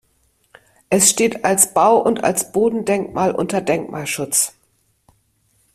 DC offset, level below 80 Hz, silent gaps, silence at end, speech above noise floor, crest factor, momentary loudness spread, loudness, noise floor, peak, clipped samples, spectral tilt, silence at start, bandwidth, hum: under 0.1%; -56 dBFS; none; 1.25 s; 46 dB; 20 dB; 9 LU; -17 LUFS; -63 dBFS; 0 dBFS; under 0.1%; -3 dB/octave; 0.9 s; 15.5 kHz; none